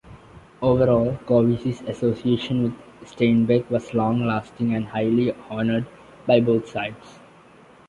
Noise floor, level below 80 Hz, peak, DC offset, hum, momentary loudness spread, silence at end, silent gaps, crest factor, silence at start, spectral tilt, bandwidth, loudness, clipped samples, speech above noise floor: -50 dBFS; -50 dBFS; -4 dBFS; under 0.1%; none; 10 LU; 0.75 s; none; 18 dB; 0.05 s; -8 dB/octave; 7.6 kHz; -22 LUFS; under 0.1%; 29 dB